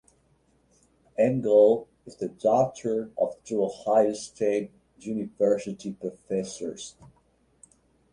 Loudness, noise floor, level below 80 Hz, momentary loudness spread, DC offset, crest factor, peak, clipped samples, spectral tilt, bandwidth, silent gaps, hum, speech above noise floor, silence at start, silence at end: -26 LUFS; -66 dBFS; -66 dBFS; 16 LU; under 0.1%; 20 dB; -8 dBFS; under 0.1%; -6 dB/octave; 10.5 kHz; none; none; 40 dB; 1.2 s; 1.2 s